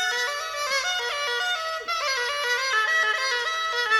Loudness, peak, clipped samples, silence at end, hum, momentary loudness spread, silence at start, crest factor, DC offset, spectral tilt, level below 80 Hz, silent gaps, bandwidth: -24 LUFS; -10 dBFS; under 0.1%; 0 s; none; 6 LU; 0 s; 16 dB; under 0.1%; 3 dB/octave; -66 dBFS; none; 18 kHz